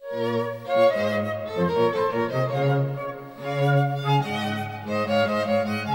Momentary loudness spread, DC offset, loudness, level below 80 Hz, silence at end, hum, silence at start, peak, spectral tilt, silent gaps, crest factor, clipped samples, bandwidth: 8 LU; under 0.1%; -24 LUFS; -64 dBFS; 0 s; none; 0 s; -10 dBFS; -7 dB/octave; none; 14 dB; under 0.1%; 16.5 kHz